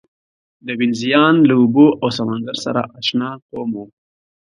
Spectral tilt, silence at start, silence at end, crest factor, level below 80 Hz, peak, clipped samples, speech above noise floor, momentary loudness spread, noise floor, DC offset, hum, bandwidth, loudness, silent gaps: -6 dB/octave; 0.65 s; 0.55 s; 16 dB; -60 dBFS; 0 dBFS; under 0.1%; over 74 dB; 15 LU; under -90 dBFS; under 0.1%; none; 10.5 kHz; -16 LUFS; 3.42-3.49 s